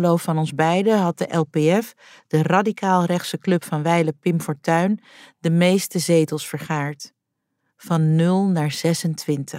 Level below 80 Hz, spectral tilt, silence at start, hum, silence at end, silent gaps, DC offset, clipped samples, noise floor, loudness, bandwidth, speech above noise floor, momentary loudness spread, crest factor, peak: -70 dBFS; -6 dB/octave; 0 s; none; 0 s; none; under 0.1%; under 0.1%; -77 dBFS; -20 LUFS; 16 kHz; 57 dB; 8 LU; 18 dB; -4 dBFS